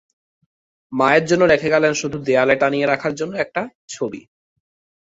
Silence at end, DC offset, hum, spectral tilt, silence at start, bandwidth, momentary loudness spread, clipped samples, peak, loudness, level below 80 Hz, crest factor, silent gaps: 0.95 s; under 0.1%; none; -4.5 dB/octave; 0.9 s; 8 kHz; 13 LU; under 0.1%; -2 dBFS; -18 LUFS; -56 dBFS; 18 dB; 3.75-3.88 s